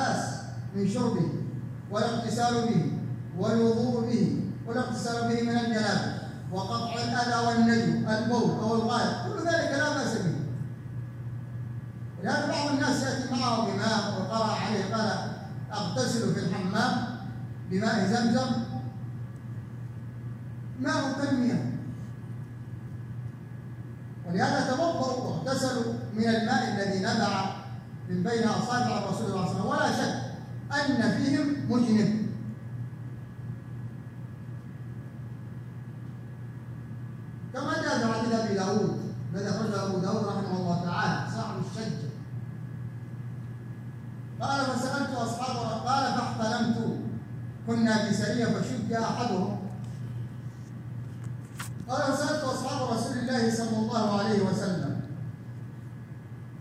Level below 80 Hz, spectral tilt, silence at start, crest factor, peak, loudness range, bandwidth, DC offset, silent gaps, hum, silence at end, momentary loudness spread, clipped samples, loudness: -60 dBFS; -5.5 dB/octave; 0 s; 16 dB; -12 dBFS; 7 LU; 13 kHz; under 0.1%; none; none; 0 s; 14 LU; under 0.1%; -29 LUFS